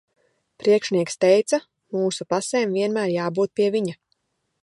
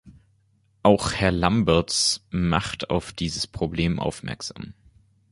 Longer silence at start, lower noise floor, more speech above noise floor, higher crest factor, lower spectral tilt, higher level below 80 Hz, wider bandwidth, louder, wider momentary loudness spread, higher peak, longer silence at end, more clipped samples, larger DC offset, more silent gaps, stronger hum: first, 0.65 s vs 0.05 s; first, -72 dBFS vs -64 dBFS; first, 51 dB vs 40 dB; about the same, 18 dB vs 22 dB; about the same, -5 dB/octave vs -4.5 dB/octave; second, -72 dBFS vs -40 dBFS; about the same, 11.5 kHz vs 11.5 kHz; about the same, -22 LUFS vs -23 LUFS; second, 7 LU vs 13 LU; second, -6 dBFS vs -2 dBFS; about the same, 0.7 s vs 0.6 s; neither; neither; neither; neither